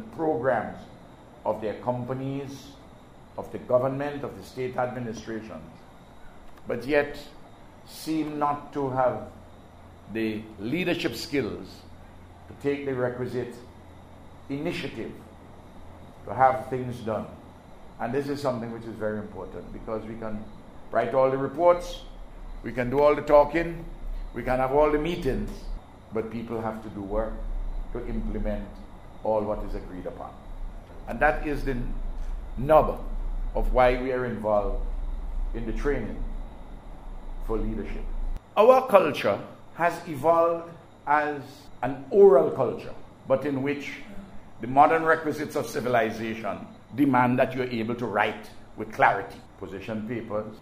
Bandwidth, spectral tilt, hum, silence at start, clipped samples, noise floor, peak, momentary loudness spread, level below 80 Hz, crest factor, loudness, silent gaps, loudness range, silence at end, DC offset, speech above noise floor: 15.5 kHz; -6.5 dB/octave; none; 0 s; under 0.1%; -48 dBFS; -2 dBFS; 22 LU; -38 dBFS; 24 dB; -26 LUFS; none; 10 LU; 0 s; under 0.1%; 23 dB